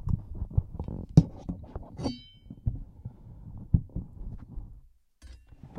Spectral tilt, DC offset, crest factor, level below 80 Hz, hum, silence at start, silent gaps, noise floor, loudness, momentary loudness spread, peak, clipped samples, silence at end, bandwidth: -9 dB/octave; under 0.1%; 28 dB; -40 dBFS; none; 0 s; none; -55 dBFS; -31 LUFS; 24 LU; -4 dBFS; under 0.1%; 0 s; 9.4 kHz